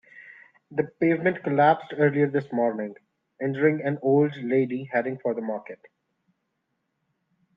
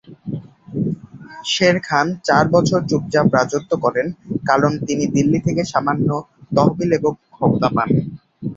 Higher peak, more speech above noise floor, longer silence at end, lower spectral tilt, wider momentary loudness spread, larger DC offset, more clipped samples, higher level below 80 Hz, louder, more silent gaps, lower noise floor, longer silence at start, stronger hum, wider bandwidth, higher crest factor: second, -6 dBFS vs 0 dBFS; first, 53 dB vs 20 dB; first, 1.8 s vs 0 s; first, -10 dB/octave vs -6 dB/octave; second, 11 LU vs 14 LU; neither; neither; second, -74 dBFS vs -50 dBFS; second, -25 LUFS vs -18 LUFS; neither; first, -77 dBFS vs -37 dBFS; about the same, 0.15 s vs 0.1 s; neither; second, 5.2 kHz vs 7.8 kHz; about the same, 20 dB vs 18 dB